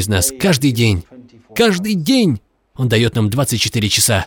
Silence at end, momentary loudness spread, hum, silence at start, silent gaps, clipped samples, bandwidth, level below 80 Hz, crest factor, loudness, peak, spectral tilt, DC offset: 0 s; 7 LU; none; 0 s; none; under 0.1%; 19 kHz; -42 dBFS; 16 dB; -15 LUFS; 0 dBFS; -4.5 dB/octave; under 0.1%